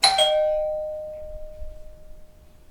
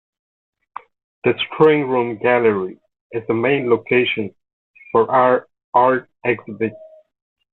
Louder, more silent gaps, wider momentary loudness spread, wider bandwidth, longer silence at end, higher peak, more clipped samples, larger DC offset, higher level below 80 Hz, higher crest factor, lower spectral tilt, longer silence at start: second, -22 LUFS vs -18 LUFS; second, none vs 3.01-3.10 s, 4.53-4.74 s, 5.64-5.73 s; first, 24 LU vs 16 LU; first, 16.5 kHz vs 4.1 kHz; second, 0.25 s vs 0.75 s; about the same, -2 dBFS vs -2 dBFS; neither; neither; first, -42 dBFS vs -60 dBFS; about the same, 22 dB vs 18 dB; second, 0 dB/octave vs -9 dB/octave; second, 0 s vs 1.25 s